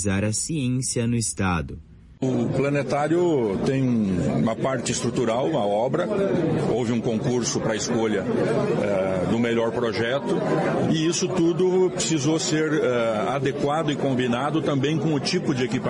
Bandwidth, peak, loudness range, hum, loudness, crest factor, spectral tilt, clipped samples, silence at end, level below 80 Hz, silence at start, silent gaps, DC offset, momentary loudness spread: 11.5 kHz; -12 dBFS; 1 LU; none; -23 LUFS; 12 dB; -5 dB/octave; under 0.1%; 0 s; -52 dBFS; 0 s; none; under 0.1%; 3 LU